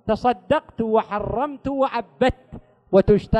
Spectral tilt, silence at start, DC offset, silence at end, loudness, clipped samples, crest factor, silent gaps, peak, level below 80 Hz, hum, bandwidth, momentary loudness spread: -8 dB/octave; 0.05 s; under 0.1%; 0 s; -22 LUFS; under 0.1%; 18 dB; none; -4 dBFS; -38 dBFS; none; 8.8 kHz; 8 LU